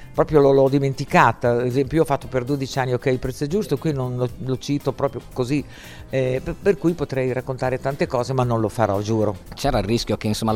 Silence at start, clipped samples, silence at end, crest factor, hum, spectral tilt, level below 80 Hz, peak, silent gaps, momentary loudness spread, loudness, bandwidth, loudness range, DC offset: 0 s; under 0.1%; 0 s; 20 dB; none; -6.5 dB/octave; -40 dBFS; 0 dBFS; none; 9 LU; -21 LUFS; 16 kHz; 5 LU; under 0.1%